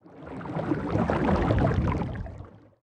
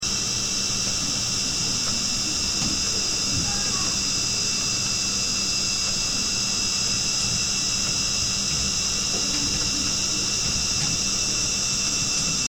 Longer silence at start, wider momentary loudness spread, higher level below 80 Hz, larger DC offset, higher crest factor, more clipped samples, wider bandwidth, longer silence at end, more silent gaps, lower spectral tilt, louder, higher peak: about the same, 0.05 s vs 0 s; first, 16 LU vs 1 LU; about the same, -38 dBFS vs -42 dBFS; second, under 0.1% vs 0.3%; first, 20 dB vs 14 dB; neither; second, 9.2 kHz vs 18 kHz; first, 0.25 s vs 0.1 s; neither; first, -9 dB/octave vs -1 dB/octave; second, -27 LUFS vs -21 LUFS; about the same, -8 dBFS vs -10 dBFS